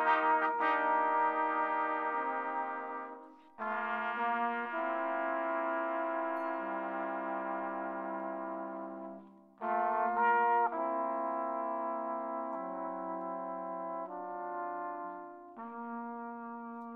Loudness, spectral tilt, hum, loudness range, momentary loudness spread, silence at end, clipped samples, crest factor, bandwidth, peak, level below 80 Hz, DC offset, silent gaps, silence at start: -35 LUFS; -7 dB/octave; none; 7 LU; 14 LU; 0 s; under 0.1%; 20 dB; 5 kHz; -16 dBFS; under -90 dBFS; under 0.1%; none; 0 s